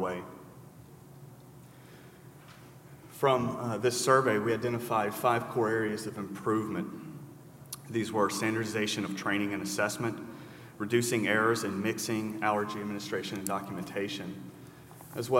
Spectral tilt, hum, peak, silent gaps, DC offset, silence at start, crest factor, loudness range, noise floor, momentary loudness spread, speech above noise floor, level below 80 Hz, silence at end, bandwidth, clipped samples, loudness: -4.5 dB/octave; none; -10 dBFS; none; under 0.1%; 0 s; 22 dB; 6 LU; -52 dBFS; 24 LU; 22 dB; -72 dBFS; 0 s; 16 kHz; under 0.1%; -31 LUFS